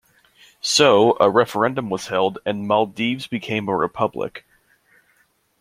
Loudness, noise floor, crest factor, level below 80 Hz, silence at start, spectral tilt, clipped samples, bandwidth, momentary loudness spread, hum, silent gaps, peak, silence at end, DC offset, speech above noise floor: -19 LUFS; -63 dBFS; 20 dB; -62 dBFS; 0.65 s; -4 dB/octave; under 0.1%; 16 kHz; 12 LU; none; none; 0 dBFS; 1.2 s; under 0.1%; 43 dB